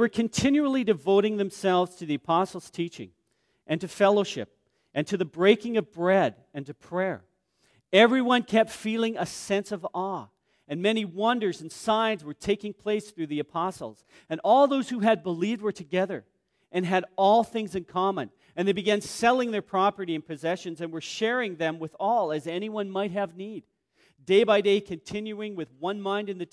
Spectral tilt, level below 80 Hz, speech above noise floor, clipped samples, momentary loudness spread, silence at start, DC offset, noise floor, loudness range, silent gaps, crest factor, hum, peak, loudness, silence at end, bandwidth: -5 dB/octave; -66 dBFS; 44 dB; under 0.1%; 13 LU; 0 s; under 0.1%; -70 dBFS; 4 LU; none; 22 dB; none; -6 dBFS; -26 LUFS; 0.1 s; 11 kHz